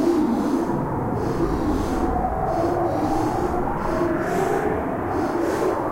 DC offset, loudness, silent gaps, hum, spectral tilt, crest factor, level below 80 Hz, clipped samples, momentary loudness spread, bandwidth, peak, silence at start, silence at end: under 0.1%; -23 LUFS; none; none; -7 dB/octave; 12 dB; -34 dBFS; under 0.1%; 3 LU; 16 kHz; -10 dBFS; 0 s; 0 s